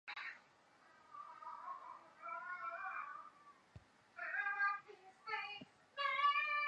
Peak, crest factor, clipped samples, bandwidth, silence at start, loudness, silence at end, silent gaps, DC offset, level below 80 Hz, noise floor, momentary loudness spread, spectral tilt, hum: -24 dBFS; 20 dB; under 0.1%; 8.8 kHz; 0.05 s; -42 LUFS; 0 s; none; under 0.1%; -82 dBFS; -69 dBFS; 24 LU; -2.5 dB/octave; none